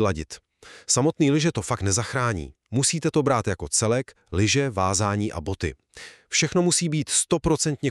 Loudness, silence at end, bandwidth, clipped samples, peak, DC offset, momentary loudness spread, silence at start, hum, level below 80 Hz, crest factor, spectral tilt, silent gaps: -23 LUFS; 0 s; 13.5 kHz; under 0.1%; -6 dBFS; under 0.1%; 11 LU; 0 s; none; -46 dBFS; 18 dB; -4 dB/octave; none